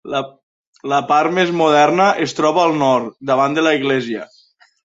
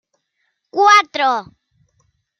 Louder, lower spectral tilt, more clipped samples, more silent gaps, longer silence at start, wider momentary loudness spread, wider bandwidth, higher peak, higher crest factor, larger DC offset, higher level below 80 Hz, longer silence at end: about the same, -16 LUFS vs -14 LUFS; first, -5 dB/octave vs -1 dB/octave; neither; first, 0.43-0.73 s vs none; second, 0.05 s vs 0.75 s; about the same, 11 LU vs 13 LU; second, 8 kHz vs 12 kHz; about the same, -2 dBFS vs 0 dBFS; about the same, 14 dB vs 18 dB; neither; first, -64 dBFS vs -70 dBFS; second, 0.6 s vs 1 s